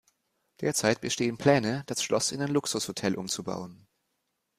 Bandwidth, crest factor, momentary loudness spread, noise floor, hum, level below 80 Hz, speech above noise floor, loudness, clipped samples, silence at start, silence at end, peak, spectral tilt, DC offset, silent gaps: 15.5 kHz; 22 dB; 9 LU; -79 dBFS; none; -66 dBFS; 51 dB; -28 LUFS; under 0.1%; 0.6 s; 0.85 s; -8 dBFS; -4 dB/octave; under 0.1%; none